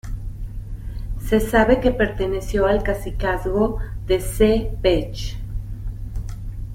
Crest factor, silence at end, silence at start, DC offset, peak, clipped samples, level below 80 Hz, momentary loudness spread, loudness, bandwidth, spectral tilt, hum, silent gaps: 18 dB; 0 s; 0.05 s; under 0.1%; -2 dBFS; under 0.1%; -28 dBFS; 16 LU; -21 LUFS; 16.5 kHz; -6 dB/octave; none; none